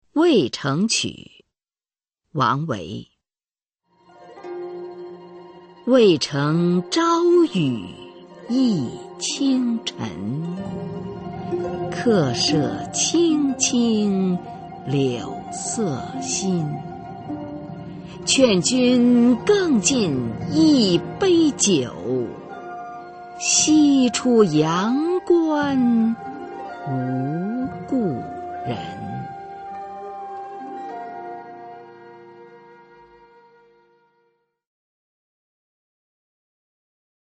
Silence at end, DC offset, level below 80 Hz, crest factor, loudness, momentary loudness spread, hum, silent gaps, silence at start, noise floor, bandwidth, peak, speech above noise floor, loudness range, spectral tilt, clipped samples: 4.8 s; under 0.1%; -56 dBFS; 20 dB; -20 LUFS; 18 LU; none; none; 0.15 s; under -90 dBFS; 8.8 kHz; -2 dBFS; over 71 dB; 14 LU; -4.5 dB/octave; under 0.1%